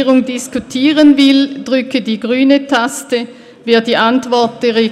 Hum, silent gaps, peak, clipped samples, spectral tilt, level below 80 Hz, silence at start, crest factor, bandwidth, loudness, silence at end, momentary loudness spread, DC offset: none; none; 0 dBFS; under 0.1%; -4 dB/octave; -54 dBFS; 0 s; 12 dB; 13.5 kHz; -12 LUFS; 0 s; 11 LU; under 0.1%